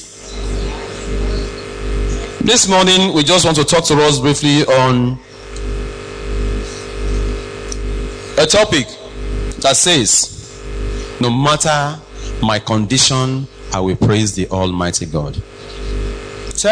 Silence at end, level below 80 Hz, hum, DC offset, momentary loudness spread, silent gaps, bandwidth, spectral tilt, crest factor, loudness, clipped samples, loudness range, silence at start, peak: 0 s; -26 dBFS; none; under 0.1%; 16 LU; none; 11 kHz; -3.5 dB/octave; 14 dB; -14 LUFS; under 0.1%; 7 LU; 0 s; -2 dBFS